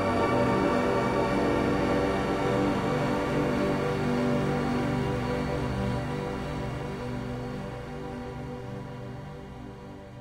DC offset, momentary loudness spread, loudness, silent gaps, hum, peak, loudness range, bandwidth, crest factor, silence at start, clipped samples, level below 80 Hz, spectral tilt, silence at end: under 0.1%; 14 LU; -28 LUFS; none; none; -14 dBFS; 10 LU; 16 kHz; 14 dB; 0 s; under 0.1%; -44 dBFS; -7 dB/octave; 0 s